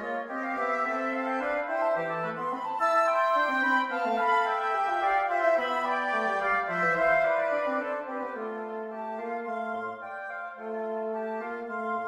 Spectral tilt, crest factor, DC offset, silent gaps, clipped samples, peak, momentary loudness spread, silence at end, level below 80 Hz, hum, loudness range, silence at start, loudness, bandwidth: -5 dB/octave; 16 dB; under 0.1%; none; under 0.1%; -14 dBFS; 11 LU; 0 s; -68 dBFS; none; 9 LU; 0 s; -28 LUFS; 12 kHz